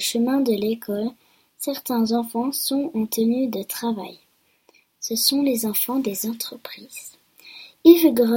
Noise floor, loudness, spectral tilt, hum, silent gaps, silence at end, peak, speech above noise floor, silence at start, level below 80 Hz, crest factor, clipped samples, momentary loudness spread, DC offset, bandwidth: -61 dBFS; -21 LUFS; -3.5 dB/octave; none; none; 0 s; 0 dBFS; 40 dB; 0 s; -66 dBFS; 22 dB; under 0.1%; 20 LU; under 0.1%; 17 kHz